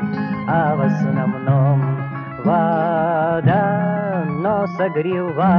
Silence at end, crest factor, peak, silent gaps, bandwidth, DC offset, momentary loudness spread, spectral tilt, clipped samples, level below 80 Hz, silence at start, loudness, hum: 0 s; 14 dB; -4 dBFS; none; 6 kHz; under 0.1%; 6 LU; -10 dB/octave; under 0.1%; -52 dBFS; 0 s; -19 LUFS; none